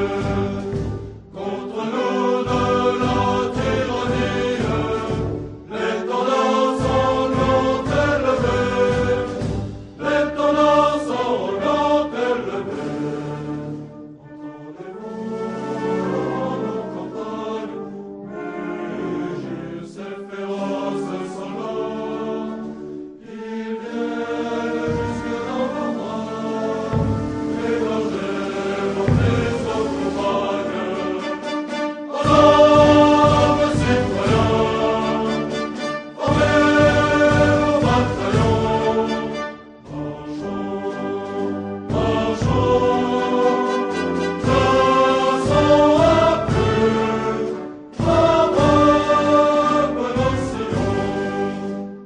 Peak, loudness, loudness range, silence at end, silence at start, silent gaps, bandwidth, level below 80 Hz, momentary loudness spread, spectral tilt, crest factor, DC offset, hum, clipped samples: 0 dBFS; -19 LUFS; 11 LU; 0 s; 0 s; none; 10 kHz; -38 dBFS; 15 LU; -6.5 dB/octave; 18 dB; under 0.1%; none; under 0.1%